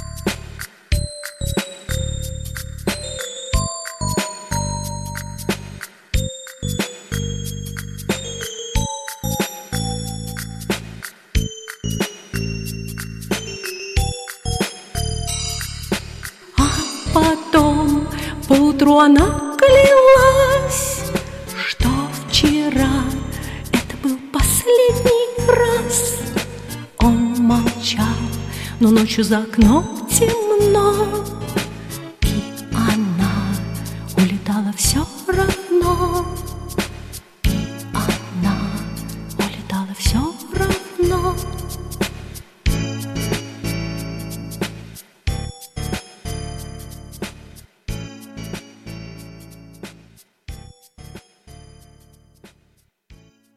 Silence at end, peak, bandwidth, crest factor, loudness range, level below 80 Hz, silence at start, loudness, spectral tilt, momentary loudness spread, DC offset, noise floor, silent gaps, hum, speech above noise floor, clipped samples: 0.4 s; -2 dBFS; 16 kHz; 18 dB; 15 LU; -30 dBFS; 0 s; -19 LUFS; -4.5 dB/octave; 17 LU; under 0.1%; -61 dBFS; none; none; 45 dB; under 0.1%